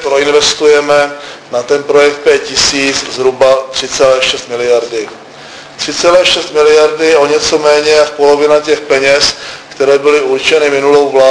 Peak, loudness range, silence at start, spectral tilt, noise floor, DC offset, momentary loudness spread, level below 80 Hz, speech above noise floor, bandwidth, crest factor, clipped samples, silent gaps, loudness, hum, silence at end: 0 dBFS; 3 LU; 0 s; -2 dB/octave; -30 dBFS; under 0.1%; 11 LU; -44 dBFS; 22 dB; 11 kHz; 10 dB; 0.7%; none; -9 LUFS; none; 0 s